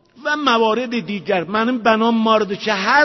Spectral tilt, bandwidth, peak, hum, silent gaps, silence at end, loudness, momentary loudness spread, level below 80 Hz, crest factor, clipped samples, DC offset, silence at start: -4.5 dB/octave; 6.2 kHz; -2 dBFS; none; none; 0 s; -17 LUFS; 6 LU; -60 dBFS; 16 dB; under 0.1%; under 0.1%; 0.2 s